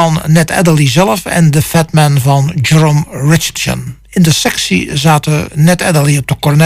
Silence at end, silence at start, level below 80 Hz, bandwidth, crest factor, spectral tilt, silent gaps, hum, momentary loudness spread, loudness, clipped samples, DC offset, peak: 0 s; 0 s; -36 dBFS; 16 kHz; 10 dB; -5 dB/octave; none; none; 4 LU; -10 LUFS; under 0.1%; under 0.1%; 0 dBFS